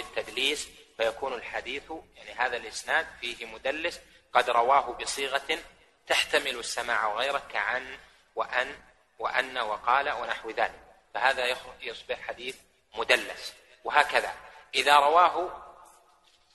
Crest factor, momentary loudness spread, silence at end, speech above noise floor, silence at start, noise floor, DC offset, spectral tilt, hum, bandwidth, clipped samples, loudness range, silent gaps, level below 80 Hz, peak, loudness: 26 dB; 16 LU; 0.7 s; 35 dB; 0 s; -63 dBFS; under 0.1%; -1 dB/octave; none; 12 kHz; under 0.1%; 6 LU; none; -62 dBFS; -4 dBFS; -28 LUFS